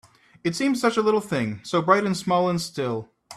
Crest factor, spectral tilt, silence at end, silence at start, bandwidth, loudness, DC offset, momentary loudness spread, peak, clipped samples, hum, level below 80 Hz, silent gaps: 20 dB; -5.5 dB/octave; 0 s; 0.45 s; 14.5 kHz; -23 LUFS; under 0.1%; 9 LU; -4 dBFS; under 0.1%; none; -62 dBFS; none